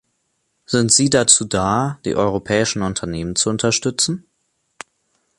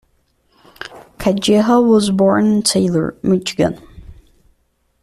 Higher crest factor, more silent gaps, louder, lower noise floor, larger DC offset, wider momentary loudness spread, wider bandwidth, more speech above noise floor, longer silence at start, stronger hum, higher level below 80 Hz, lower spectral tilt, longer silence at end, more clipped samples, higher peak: first, 20 dB vs 14 dB; neither; about the same, -17 LUFS vs -15 LUFS; first, -69 dBFS vs -62 dBFS; neither; second, 10 LU vs 21 LU; second, 12 kHz vs 13.5 kHz; about the same, 51 dB vs 49 dB; about the same, 0.7 s vs 0.8 s; neither; about the same, -46 dBFS vs -46 dBFS; second, -3 dB/octave vs -5 dB/octave; first, 1.2 s vs 0.9 s; neither; about the same, 0 dBFS vs -2 dBFS